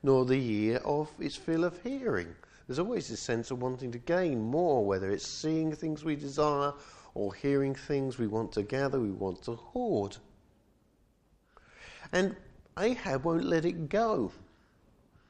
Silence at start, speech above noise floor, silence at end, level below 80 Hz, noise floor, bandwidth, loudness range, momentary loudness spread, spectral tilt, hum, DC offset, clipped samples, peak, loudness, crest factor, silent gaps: 0.05 s; 37 dB; 0.85 s; -58 dBFS; -68 dBFS; 9.8 kHz; 5 LU; 10 LU; -6 dB/octave; none; under 0.1%; under 0.1%; -14 dBFS; -32 LUFS; 18 dB; none